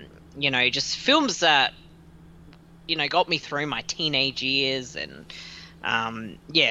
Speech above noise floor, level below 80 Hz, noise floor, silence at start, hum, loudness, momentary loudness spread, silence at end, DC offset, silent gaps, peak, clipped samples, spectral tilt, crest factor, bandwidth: 24 dB; -56 dBFS; -49 dBFS; 0 s; none; -23 LUFS; 17 LU; 0 s; under 0.1%; none; -6 dBFS; under 0.1%; -2.5 dB/octave; 20 dB; 11.5 kHz